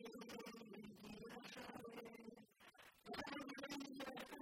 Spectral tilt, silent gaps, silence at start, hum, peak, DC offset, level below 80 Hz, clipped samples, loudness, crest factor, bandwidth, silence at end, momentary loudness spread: -4 dB/octave; none; 0 s; none; -36 dBFS; under 0.1%; -80 dBFS; under 0.1%; -54 LUFS; 20 dB; 16 kHz; 0 s; 12 LU